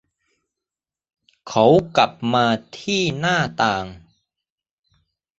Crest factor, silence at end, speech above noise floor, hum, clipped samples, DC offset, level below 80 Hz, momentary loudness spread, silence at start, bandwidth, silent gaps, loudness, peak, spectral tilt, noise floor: 20 dB; 1.4 s; 71 dB; none; under 0.1%; under 0.1%; -54 dBFS; 10 LU; 1.45 s; 8 kHz; none; -19 LUFS; -2 dBFS; -5 dB/octave; -90 dBFS